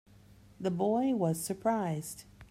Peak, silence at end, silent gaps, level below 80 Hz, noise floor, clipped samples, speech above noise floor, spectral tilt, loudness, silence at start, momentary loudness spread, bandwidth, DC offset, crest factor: -16 dBFS; 0.05 s; none; -66 dBFS; -58 dBFS; under 0.1%; 26 dB; -6 dB/octave; -32 LUFS; 0.3 s; 11 LU; 16 kHz; under 0.1%; 16 dB